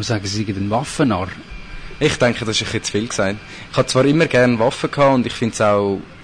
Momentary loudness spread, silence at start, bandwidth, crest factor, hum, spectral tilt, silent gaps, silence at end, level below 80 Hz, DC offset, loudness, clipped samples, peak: 10 LU; 0 s; 10 kHz; 12 dB; none; -5 dB/octave; none; 0 s; -42 dBFS; 0.2%; -18 LUFS; under 0.1%; -6 dBFS